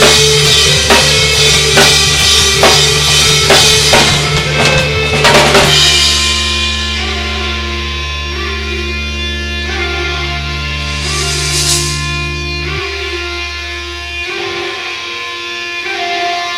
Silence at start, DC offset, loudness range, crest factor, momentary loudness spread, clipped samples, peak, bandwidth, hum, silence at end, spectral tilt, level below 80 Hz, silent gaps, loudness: 0 s; under 0.1%; 11 LU; 12 dB; 12 LU; 0.2%; 0 dBFS; 17 kHz; none; 0 s; -2 dB/octave; -24 dBFS; none; -9 LUFS